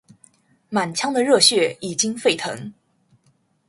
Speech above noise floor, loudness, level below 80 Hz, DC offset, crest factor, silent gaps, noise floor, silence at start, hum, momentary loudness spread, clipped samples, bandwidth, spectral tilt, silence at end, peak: 43 dB; -19 LUFS; -66 dBFS; under 0.1%; 20 dB; none; -63 dBFS; 0.7 s; none; 15 LU; under 0.1%; 11.5 kHz; -2.5 dB/octave; 1 s; -2 dBFS